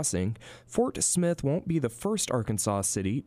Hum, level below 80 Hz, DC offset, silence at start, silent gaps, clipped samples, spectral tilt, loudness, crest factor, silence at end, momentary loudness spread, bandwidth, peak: none; -54 dBFS; under 0.1%; 0 s; none; under 0.1%; -4.5 dB/octave; -28 LUFS; 16 dB; 0.05 s; 7 LU; 15.5 kHz; -12 dBFS